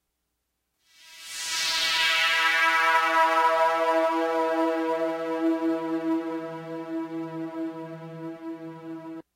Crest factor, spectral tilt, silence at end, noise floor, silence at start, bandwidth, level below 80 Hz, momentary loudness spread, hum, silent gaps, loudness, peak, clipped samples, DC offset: 18 dB; -2.5 dB/octave; 0.15 s; -79 dBFS; 1.05 s; 16 kHz; -72 dBFS; 18 LU; none; none; -24 LUFS; -8 dBFS; under 0.1%; under 0.1%